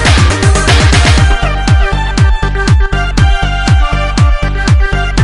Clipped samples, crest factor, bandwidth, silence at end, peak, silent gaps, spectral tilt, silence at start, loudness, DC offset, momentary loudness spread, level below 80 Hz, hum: 0.3%; 8 dB; 11 kHz; 0 s; 0 dBFS; none; -5 dB/octave; 0 s; -10 LUFS; 0.6%; 6 LU; -10 dBFS; none